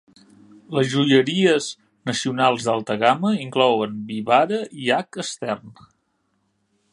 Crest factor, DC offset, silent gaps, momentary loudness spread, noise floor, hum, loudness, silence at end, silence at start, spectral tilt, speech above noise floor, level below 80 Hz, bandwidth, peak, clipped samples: 20 dB; under 0.1%; none; 12 LU; -69 dBFS; none; -21 LUFS; 1.2 s; 0.7 s; -5 dB/octave; 49 dB; -66 dBFS; 11.5 kHz; 0 dBFS; under 0.1%